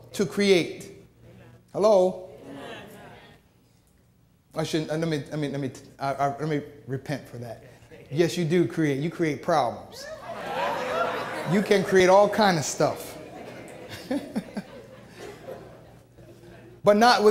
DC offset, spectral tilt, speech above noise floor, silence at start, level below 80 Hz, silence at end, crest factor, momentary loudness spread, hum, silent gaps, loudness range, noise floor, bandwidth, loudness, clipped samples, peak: under 0.1%; -5 dB/octave; 37 dB; 0.1 s; -62 dBFS; 0 s; 22 dB; 22 LU; none; none; 10 LU; -61 dBFS; 16 kHz; -24 LUFS; under 0.1%; -4 dBFS